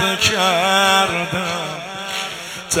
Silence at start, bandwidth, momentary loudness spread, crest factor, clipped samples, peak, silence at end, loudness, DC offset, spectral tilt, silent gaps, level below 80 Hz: 0 s; 16.5 kHz; 13 LU; 18 dB; under 0.1%; 0 dBFS; 0 s; -17 LUFS; under 0.1%; -2 dB/octave; none; -54 dBFS